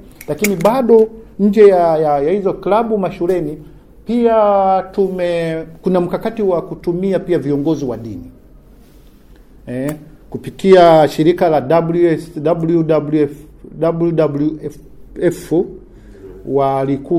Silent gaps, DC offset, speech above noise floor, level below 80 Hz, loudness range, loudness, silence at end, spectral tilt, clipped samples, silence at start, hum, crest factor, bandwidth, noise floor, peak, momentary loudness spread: none; under 0.1%; 29 dB; -44 dBFS; 7 LU; -14 LUFS; 0 s; -7 dB/octave; under 0.1%; 0.2 s; none; 14 dB; 16 kHz; -42 dBFS; 0 dBFS; 16 LU